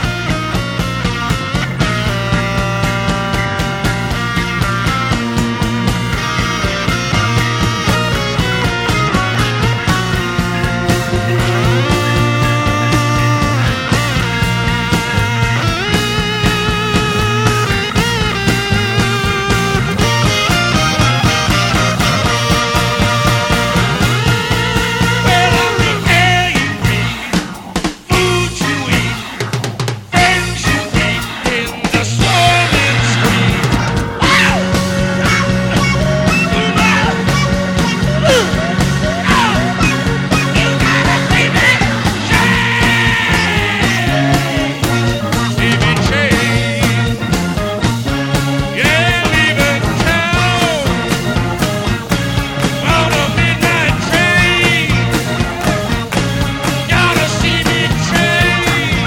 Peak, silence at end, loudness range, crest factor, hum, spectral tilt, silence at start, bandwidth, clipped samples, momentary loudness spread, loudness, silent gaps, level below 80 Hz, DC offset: 0 dBFS; 0 s; 3 LU; 14 dB; none; -4.5 dB/octave; 0 s; 16.5 kHz; under 0.1%; 5 LU; -13 LUFS; none; -26 dBFS; under 0.1%